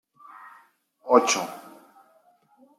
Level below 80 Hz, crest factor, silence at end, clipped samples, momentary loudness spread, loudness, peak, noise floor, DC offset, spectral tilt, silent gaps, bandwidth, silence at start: -84 dBFS; 24 dB; 1.2 s; under 0.1%; 27 LU; -22 LUFS; -4 dBFS; -61 dBFS; under 0.1%; -2 dB/octave; none; 15.5 kHz; 1.05 s